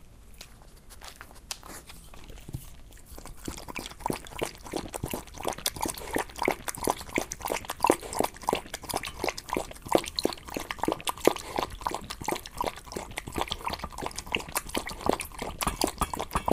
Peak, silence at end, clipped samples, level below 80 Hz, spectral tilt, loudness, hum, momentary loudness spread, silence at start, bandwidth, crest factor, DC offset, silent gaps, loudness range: -2 dBFS; 0 s; under 0.1%; -46 dBFS; -3 dB/octave; -32 LUFS; none; 19 LU; 0 s; 16 kHz; 32 dB; under 0.1%; none; 10 LU